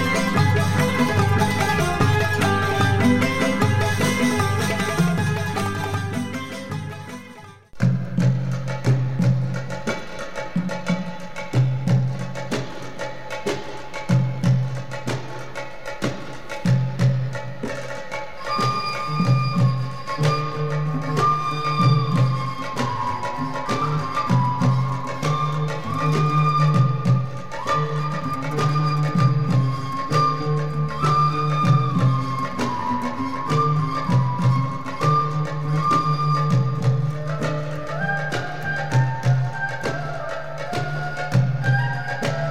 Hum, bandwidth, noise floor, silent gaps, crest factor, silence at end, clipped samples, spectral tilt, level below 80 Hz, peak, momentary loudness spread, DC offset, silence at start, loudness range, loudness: none; 14.5 kHz; -42 dBFS; none; 16 dB; 0 s; under 0.1%; -6.5 dB/octave; -48 dBFS; -6 dBFS; 11 LU; 2%; 0 s; 6 LU; -22 LUFS